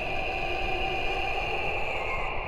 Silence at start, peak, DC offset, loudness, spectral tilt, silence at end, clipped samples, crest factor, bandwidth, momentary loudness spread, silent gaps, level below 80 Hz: 0 s; -16 dBFS; under 0.1%; -29 LUFS; -4.5 dB/octave; 0 s; under 0.1%; 12 dB; 12 kHz; 1 LU; none; -38 dBFS